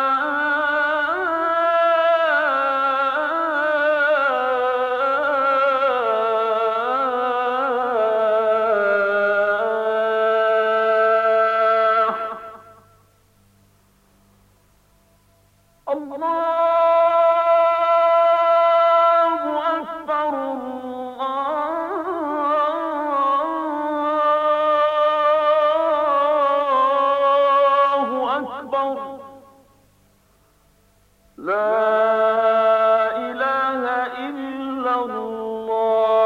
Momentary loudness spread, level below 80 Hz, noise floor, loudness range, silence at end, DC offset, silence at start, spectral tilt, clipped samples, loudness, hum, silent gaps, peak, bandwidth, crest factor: 10 LU; -64 dBFS; -58 dBFS; 7 LU; 0 s; under 0.1%; 0 s; -4.5 dB/octave; under 0.1%; -19 LUFS; none; none; -8 dBFS; 6.8 kHz; 12 dB